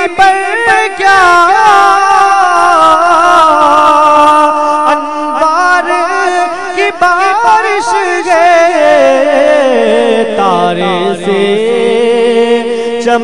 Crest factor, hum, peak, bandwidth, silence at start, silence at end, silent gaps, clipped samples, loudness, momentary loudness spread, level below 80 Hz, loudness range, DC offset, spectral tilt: 8 dB; none; 0 dBFS; 12 kHz; 0 s; 0 s; none; 3%; -7 LUFS; 6 LU; -46 dBFS; 4 LU; 2%; -3.5 dB/octave